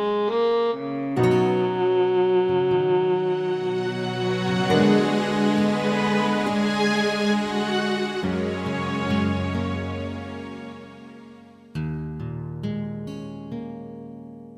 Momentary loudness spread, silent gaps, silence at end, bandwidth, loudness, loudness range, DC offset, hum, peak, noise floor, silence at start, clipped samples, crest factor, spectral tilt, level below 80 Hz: 15 LU; none; 0 s; 12 kHz; -23 LUFS; 12 LU; under 0.1%; none; -8 dBFS; -46 dBFS; 0 s; under 0.1%; 16 dB; -6.5 dB/octave; -54 dBFS